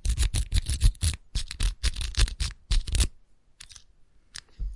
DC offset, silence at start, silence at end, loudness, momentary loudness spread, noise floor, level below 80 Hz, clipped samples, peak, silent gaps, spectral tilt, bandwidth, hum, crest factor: under 0.1%; 0.05 s; 0 s; -29 LUFS; 21 LU; -56 dBFS; -28 dBFS; under 0.1%; -8 dBFS; none; -3 dB/octave; 11.5 kHz; none; 20 dB